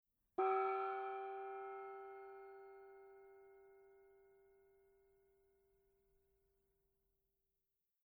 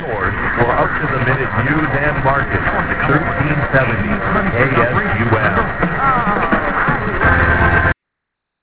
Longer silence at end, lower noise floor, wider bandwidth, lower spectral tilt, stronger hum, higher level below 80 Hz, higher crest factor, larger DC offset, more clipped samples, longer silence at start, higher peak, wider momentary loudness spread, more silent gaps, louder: first, 3.95 s vs 0.7 s; first, under -90 dBFS vs -78 dBFS; first, 4.7 kHz vs 4 kHz; second, -5.5 dB/octave vs -10.5 dB/octave; neither; second, -88 dBFS vs -28 dBFS; first, 22 dB vs 16 dB; neither; neither; first, 0.4 s vs 0 s; second, -28 dBFS vs 0 dBFS; first, 25 LU vs 4 LU; neither; second, -44 LUFS vs -15 LUFS